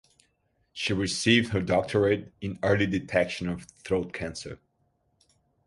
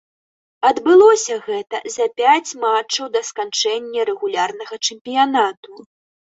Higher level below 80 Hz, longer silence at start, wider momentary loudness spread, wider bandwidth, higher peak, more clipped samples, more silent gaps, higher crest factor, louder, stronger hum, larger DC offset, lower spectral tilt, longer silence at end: first, -52 dBFS vs -66 dBFS; first, 0.75 s vs 0.6 s; first, 16 LU vs 11 LU; first, 11.5 kHz vs 8 kHz; second, -8 dBFS vs -2 dBFS; neither; second, none vs 5.01-5.05 s, 5.57-5.63 s; about the same, 20 dB vs 16 dB; second, -27 LUFS vs -17 LUFS; neither; neither; first, -5 dB/octave vs -1 dB/octave; first, 1.1 s vs 0.5 s